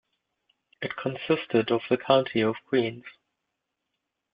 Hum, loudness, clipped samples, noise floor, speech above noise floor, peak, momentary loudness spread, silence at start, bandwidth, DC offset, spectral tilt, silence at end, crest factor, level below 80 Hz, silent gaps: none; -26 LUFS; under 0.1%; -82 dBFS; 56 dB; -6 dBFS; 12 LU; 0.8 s; 5.2 kHz; under 0.1%; -4 dB/octave; 1.25 s; 22 dB; -68 dBFS; none